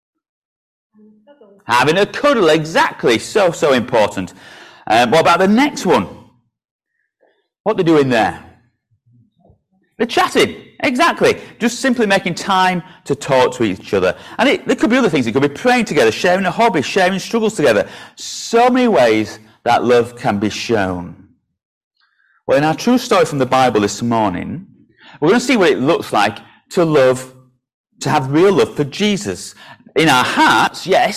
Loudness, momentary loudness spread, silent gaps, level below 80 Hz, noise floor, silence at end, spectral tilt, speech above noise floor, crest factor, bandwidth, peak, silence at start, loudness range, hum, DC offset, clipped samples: -15 LUFS; 11 LU; 6.71-6.79 s, 7.60-7.64 s, 21.65-21.91 s, 27.74-27.84 s; -50 dBFS; -61 dBFS; 0 s; -4.5 dB/octave; 47 dB; 14 dB; 15.5 kHz; -2 dBFS; 1.7 s; 4 LU; none; under 0.1%; under 0.1%